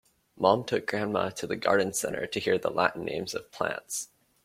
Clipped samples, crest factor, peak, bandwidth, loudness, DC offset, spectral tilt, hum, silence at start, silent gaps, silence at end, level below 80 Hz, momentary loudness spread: under 0.1%; 24 dB; -6 dBFS; 16.5 kHz; -29 LUFS; under 0.1%; -3.5 dB/octave; none; 0.35 s; none; 0.4 s; -64 dBFS; 9 LU